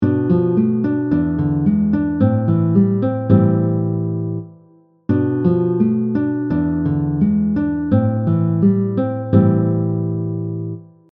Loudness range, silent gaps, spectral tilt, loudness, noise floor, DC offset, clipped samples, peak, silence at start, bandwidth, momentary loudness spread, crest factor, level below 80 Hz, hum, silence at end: 2 LU; none; -13 dB/octave; -17 LUFS; -51 dBFS; under 0.1%; under 0.1%; 0 dBFS; 0 s; 3.9 kHz; 8 LU; 16 dB; -46 dBFS; none; 0.25 s